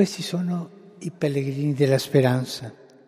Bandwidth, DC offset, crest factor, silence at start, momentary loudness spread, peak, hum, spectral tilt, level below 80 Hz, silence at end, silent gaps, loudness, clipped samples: 15 kHz; under 0.1%; 18 dB; 0 s; 17 LU; -6 dBFS; none; -6.5 dB/octave; -68 dBFS; 0.35 s; none; -23 LUFS; under 0.1%